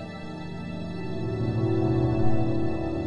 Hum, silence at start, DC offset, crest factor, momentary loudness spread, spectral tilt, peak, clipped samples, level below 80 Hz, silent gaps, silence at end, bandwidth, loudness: none; 0 s; under 0.1%; 16 dB; 12 LU; -9 dB/octave; -8 dBFS; under 0.1%; -44 dBFS; none; 0 s; 8.2 kHz; -28 LUFS